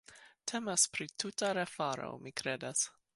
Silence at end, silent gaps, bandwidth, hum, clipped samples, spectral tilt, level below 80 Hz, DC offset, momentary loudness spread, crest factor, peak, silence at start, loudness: 0.25 s; none; 12 kHz; none; under 0.1%; -2 dB/octave; -76 dBFS; under 0.1%; 11 LU; 22 dB; -16 dBFS; 0.1 s; -35 LUFS